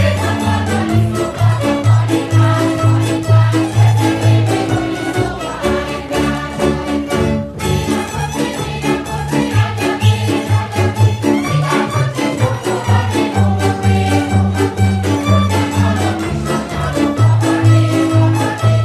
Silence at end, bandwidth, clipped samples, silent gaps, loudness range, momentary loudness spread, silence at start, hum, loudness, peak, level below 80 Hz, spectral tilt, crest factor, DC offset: 0 s; 14 kHz; under 0.1%; none; 4 LU; 6 LU; 0 s; none; -15 LUFS; 0 dBFS; -34 dBFS; -6.5 dB/octave; 14 dB; under 0.1%